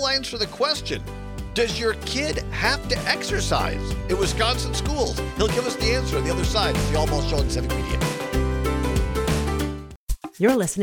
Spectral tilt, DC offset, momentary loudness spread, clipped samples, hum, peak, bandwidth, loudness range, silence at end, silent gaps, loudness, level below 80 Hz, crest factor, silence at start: -4.5 dB/octave; under 0.1%; 7 LU; under 0.1%; none; -4 dBFS; 19.5 kHz; 1 LU; 0 s; 9.96-10.07 s; -23 LUFS; -30 dBFS; 20 dB; 0 s